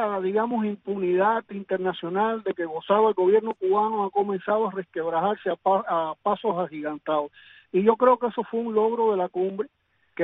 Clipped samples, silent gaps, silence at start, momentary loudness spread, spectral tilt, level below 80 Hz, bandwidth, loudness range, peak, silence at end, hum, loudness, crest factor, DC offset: under 0.1%; none; 0 s; 8 LU; -9 dB/octave; -72 dBFS; 4 kHz; 2 LU; -6 dBFS; 0 s; none; -25 LUFS; 18 dB; under 0.1%